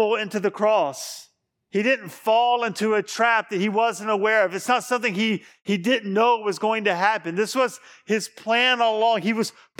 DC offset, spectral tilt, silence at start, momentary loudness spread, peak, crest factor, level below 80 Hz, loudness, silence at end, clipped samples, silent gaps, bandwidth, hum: under 0.1%; -4 dB/octave; 0 s; 7 LU; -4 dBFS; 18 dB; -82 dBFS; -22 LUFS; 0.3 s; under 0.1%; none; 18 kHz; none